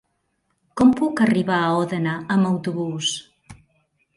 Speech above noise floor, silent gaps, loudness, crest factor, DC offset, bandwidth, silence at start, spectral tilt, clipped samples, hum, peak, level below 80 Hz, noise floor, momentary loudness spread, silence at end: 51 dB; none; -20 LUFS; 18 dB; under 0.1%; 11.5 kHz; 0.75 s; -5.5 dB/octave; under 0.1%; none; -4 dBFS; -58 dBFS; -71 dBFS; 8 LU; 0.65 s